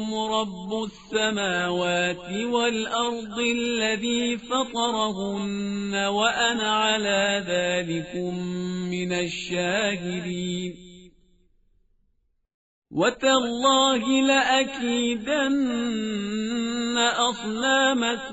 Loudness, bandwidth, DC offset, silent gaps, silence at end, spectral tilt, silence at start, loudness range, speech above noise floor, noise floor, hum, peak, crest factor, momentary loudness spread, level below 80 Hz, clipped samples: -24 LUFS; 8 kHz; under 0.1%; 12.54-12.82 s; 0 s; -2.5 dB/octave; 0 s; 7 LU; 45 dB; -69 dBFS; none; -6 dBFS; 18 dB; 9 LU; -58 dBFS; under 0.1%